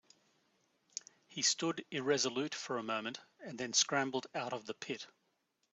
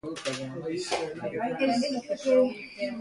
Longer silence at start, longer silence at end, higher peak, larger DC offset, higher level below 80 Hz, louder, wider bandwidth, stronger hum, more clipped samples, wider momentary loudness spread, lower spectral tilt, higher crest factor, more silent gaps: first, 1.3 s vs 0.05 s; first, 0.65 s vs 0 s; second, -16 dBFS vs -12 dBFS; neither; second, -86 dBFS vs -66 dBFS; second, -36 LUFS vs -29 LUFS; second, 8.2 kHz vs 11.5 kHz; neither; neither; first, 16 LU vs 10 LU; second, -2 dB/octave vs -4.5 dB/octave; first, 22 dB vs 16 dB; neither